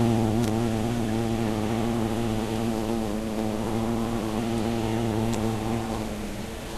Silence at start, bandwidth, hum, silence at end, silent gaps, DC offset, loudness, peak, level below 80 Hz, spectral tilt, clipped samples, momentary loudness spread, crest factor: 0 s; 14 kHz; none; 0 s; none; under 0.1%; -27 LUFS; -10 dBFS; -40 dBFS; -6.5 dB/octave; under 0.1%; 4 LU; 16 dB